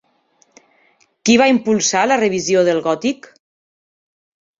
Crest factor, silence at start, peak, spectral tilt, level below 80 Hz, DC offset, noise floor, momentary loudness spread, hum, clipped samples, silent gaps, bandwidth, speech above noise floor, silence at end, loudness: 18 dB; 1.25 s; -2 dBFS; -3.5 dB/octave; -60 dBFS; under 0.1%; -59 dBFS; 9 LU; none; under 0.1%; none; 7.8 kHz; 44 dB; 1.45 s; -15 LUFS